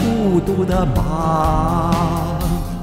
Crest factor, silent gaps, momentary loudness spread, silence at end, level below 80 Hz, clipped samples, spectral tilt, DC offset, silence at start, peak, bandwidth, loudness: 14 dB; none; 4 LU; 0 s; -26 dBFS; under 0.1%; -7.5 dB/octave; under 0.1%; 0 s; -4 dBFS; 16.5 kHz; -18 LUFS